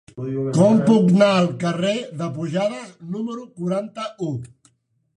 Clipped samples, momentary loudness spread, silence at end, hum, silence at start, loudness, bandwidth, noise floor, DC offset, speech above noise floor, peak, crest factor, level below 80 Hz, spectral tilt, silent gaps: under 0.1%; 15 LU; 0.7 s; none; 0.15 s; -20 LUFS; 10.5 kHz; -64 dBFS; under 0.1%; 45 dB; -4 dBFS; 18 dB; -62 dBFS; -7 dB/octave; none